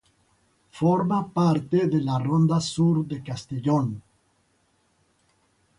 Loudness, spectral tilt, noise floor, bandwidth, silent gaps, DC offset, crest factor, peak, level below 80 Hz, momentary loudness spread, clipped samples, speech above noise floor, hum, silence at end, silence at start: -24 LUFS; -7.5 dB/octave; -67 dBFS; 11 kHz; none; under 0.1%; 16 dB; -10 dBFS; -60 dBFS; 10 LU; under 0.1%; 44 dB; none; 1.8 s; 0.75 s